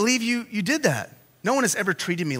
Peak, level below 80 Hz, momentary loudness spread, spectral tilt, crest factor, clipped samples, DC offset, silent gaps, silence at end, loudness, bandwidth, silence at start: -4 dBFS; -68 dBFS; 9 LU; -3.5 dB/octave; 20 dB; under 0.1%; under 0.1%; none; 0 s; -24 LUFS; 16 kHz; 0 s